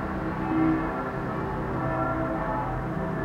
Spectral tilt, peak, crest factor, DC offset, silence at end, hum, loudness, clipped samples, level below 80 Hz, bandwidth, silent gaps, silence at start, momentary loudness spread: -9 dB/octave; -14 dBFS; 14 dB; under 0.1%; 0 s; none; -28 LUFS; under 0.1%; -42 dBFS; 8.6 kHz; none; 0 s; 6 LU